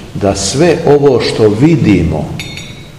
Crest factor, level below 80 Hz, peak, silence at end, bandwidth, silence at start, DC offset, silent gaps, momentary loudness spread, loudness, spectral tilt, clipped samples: 10 dB; -32 dBFS; 0 dBFS; 0 s; 12.5 kHz; 0 s; 0.9%; none; 13 LU; -10 LUFS; -6 dB/octave; 2%